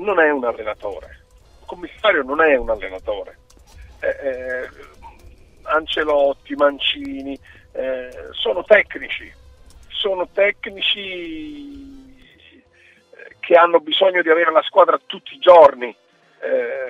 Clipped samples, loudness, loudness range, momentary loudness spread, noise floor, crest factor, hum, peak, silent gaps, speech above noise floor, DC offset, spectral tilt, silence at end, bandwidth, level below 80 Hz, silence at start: under 0.1%; -17 LUFS; 9 LU; 19 LU; -53 dBFS; 20 dB; none; 0 dBFS; none; 35 dB; under 0.1%; -4.5 dB/octave; 0 s; 7.4 kHz; -48 dBFS; 0 s